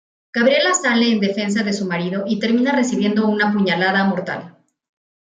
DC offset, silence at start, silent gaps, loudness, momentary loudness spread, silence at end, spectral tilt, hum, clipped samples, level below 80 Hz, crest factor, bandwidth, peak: under 0.1%; 0.35 s; none; -18 LUFS; 7 LU; 0.75 s; -4.5 dB/octave; none; under 0.1%; -66 dBFS; 14 dB; 9.6 kHz; -4 dBFS